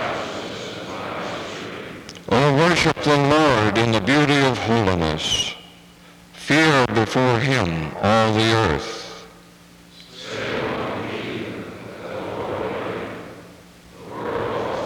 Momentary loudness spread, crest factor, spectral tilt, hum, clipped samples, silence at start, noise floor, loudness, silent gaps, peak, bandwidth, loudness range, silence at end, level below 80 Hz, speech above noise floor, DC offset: 18 LU; 18 dB; -5 dB/octave; none; under 0.1%; 0 s; -47 dBFS; -20 LUFS; none; -4 dBFS; 18.5 kHz; 12 LU; 0 s; -48 dBFS; 30 dB; under 0.1%